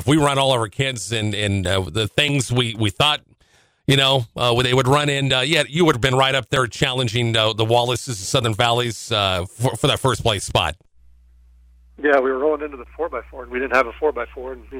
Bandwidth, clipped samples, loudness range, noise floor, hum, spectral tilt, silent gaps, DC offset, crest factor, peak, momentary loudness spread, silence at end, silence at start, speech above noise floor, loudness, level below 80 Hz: 16.5 kHz; under 0.1%; 5 LU; -58 dBFS; none; -4.5 dB/octave; none; under 0.1%; 16 dB; -4 dBFS; 9 LU; 0 s; 0 s; 39 dB; -19 LUFS; -44 dBFS